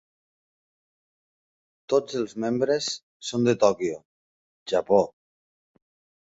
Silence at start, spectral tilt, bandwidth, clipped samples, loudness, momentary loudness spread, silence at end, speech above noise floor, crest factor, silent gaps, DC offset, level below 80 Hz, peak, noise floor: 1.9 s; -5 dB/octave; 8 kHz; under 0.1%; -25 LUFS; 11 LU; 1.2 s; over 66 dB; 22 dB; 3.03-3.20 s, 4.05-4.66 s; under 0.1%; -66 dBFS; -6 dBFS; under -90 dBFS